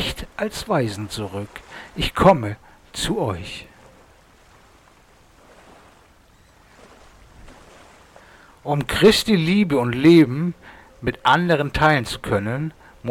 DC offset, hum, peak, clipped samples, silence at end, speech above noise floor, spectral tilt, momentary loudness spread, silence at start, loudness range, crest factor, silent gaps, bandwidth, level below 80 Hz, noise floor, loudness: under 0.1%; none; -4 dBFS; under 0.1%; 0 s; 34 dB; -5.5 dB/octave; 20 LU; 0 s; 14 LU; 18 dB; none; 17 kHz; -42 dBFS; -53 dBFS; -19 LUFS